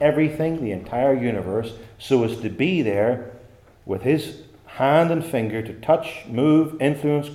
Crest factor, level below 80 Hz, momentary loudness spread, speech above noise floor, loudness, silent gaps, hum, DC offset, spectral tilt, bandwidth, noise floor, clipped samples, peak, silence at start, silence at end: 16 dB; -54 dBFS; 11 LU; 27 dB; -22 LUFS; none; none; under 0.1%; -7.5 dB/octave; 15 kHz; -48 dBFS; under 0.1%; -4 dBFS; 0 s; 0 s